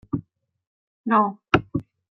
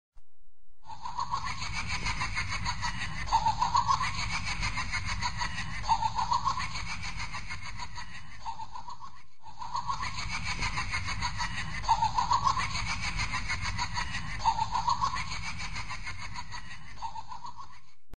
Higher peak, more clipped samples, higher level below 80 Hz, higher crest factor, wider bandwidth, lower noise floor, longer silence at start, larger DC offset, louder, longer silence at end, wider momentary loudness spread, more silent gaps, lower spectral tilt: first, -2 dBFS vs -12 dBFS; neither; second, -52 dBFS vs -44 dBFS; about the same, 24 dB vs 20 dB; second, 6.6 kHz vs 9.8 kHz; second, -46 dBFS vs -55 dBFS; about the same, 0.15 s vs 0.1 s; second, under 0.1% vs 2%; first, -23 LUFS vs -32 LUFS; first, 0.3 s vs 0 s; second, 12 LU vs 15 LU; first, 0.67-1.04 s vs none; first, -7 dB/octave vs -2.5 dB/octave